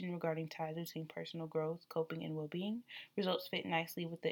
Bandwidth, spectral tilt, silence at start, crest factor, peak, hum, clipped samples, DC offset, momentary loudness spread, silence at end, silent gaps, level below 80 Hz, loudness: 19.5 kHz; -6 dB/octave; 0 s; 20 dB; -22 dBFS; none; under 0.1%; under 0.1%; 8 LU; 0 s; none; -88 dBFS; -41 LUFS